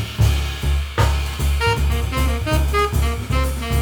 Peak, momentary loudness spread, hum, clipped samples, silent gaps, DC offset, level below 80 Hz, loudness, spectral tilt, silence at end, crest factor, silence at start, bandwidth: -4 dBFS; 3 LU; none; under 0.1%; none; under 0.1%; -20 dBFS; -20 LUFS; -5 dB/octave; 0 s; 14 dB; 0 s; over 20 kHz